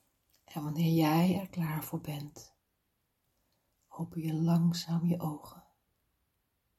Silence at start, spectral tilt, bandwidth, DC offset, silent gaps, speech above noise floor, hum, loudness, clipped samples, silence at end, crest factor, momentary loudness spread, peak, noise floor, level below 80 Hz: 0.5 s; -7 dB/octave; 14.5 kHz; under 0.1%; none; 48 dB; none; -32 LUFS; under 0.1%; 1.2 s; 18 dB; 16 LU; -16 dBFS; -80 dBFS; -70 dBFS